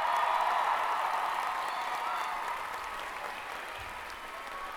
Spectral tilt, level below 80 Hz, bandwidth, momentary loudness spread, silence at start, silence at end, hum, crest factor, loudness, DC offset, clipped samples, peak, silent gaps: -1 dB/octave; -62 dBFS; over 20 kHz; 12 LU; 0 s; 0 s; none; 16 dB; -33 LUFS; under 0.1%; under 0.1%; -18 dBFS; none